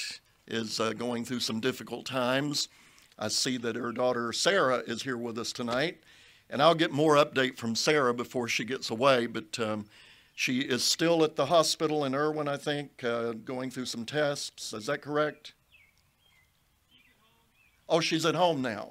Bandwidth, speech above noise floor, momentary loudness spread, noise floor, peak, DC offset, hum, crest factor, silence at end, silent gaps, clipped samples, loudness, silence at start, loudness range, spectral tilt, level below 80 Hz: 16 kHz; 39 dB; 11 LU; -69 dBFS; -8 dBFS; under 0.1%; none; 22 dB; 0 s; none; under 0.1%; -29 LUFS; 0 s; 7 LU; -3.5 dB/octave; -72 dBFS